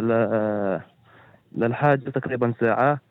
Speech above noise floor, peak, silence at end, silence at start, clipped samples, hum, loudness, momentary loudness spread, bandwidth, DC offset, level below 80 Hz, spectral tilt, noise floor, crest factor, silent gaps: 31 dB; -6 dBFS; 0.1 s; 0 s; under 0.1%; none; -23 LUFS; 7 LU; 4.4 kHz; under 0.1%; -66 dBFS; -10.5 dB/octave; -53 dBFS; 16 dB; none